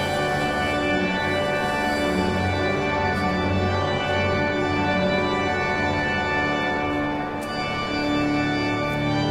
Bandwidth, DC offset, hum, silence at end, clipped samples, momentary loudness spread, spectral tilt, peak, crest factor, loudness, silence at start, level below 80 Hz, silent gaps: 15 kHz; under 0.1%; none; 0 s; under 0.1%; 3 LU; -5.5 dB/octave; -8 dBFS; 14 dB; -23 LUFS; 0 s; -44 dBFS; none